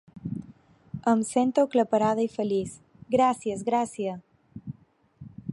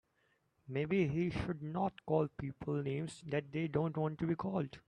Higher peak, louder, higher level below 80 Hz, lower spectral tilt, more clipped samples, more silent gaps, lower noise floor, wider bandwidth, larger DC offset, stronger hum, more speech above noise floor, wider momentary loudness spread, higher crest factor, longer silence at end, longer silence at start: first, -10 dBFS vs -18 dBFS; first, -26 LUFS vs -38 LUFS; about the same, -64 dBFS vs -62 dBFS; second, -6 dB/octave vs -8 dB/octave; neither; neither; second, -59 dBFS vs -77 dBFS; first, 11.5 kHz vs 10 kHz; neither; neither; second, 34 dB vs 40 dB; first, 19 LU vs 6 LU; about the same, 18 dB vs 18 dB; about the same, 0 s vs 0.1 s; second, 0.15 s vs 0.65 s